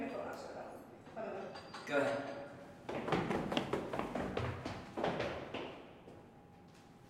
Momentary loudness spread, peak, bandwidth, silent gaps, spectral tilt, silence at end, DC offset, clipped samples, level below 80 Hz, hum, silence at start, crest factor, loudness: 20 LU; -16 dBFS; 16 kHz; none; -6 dB/octave; 0 s; under 0.1%; under 0.1%; -64 dBFS; none; 0 s; 26 dB; -41 LUFS